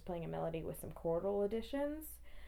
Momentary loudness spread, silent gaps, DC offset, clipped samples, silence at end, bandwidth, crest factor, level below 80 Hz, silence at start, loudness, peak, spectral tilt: 9 LU; none; under 0.1%; under 0.1%; 0 s; over 20 kHz; 12 dB; -56 dBFS; 0 s; -41 LUFS; -28 dBFS; -6.5 dB/octave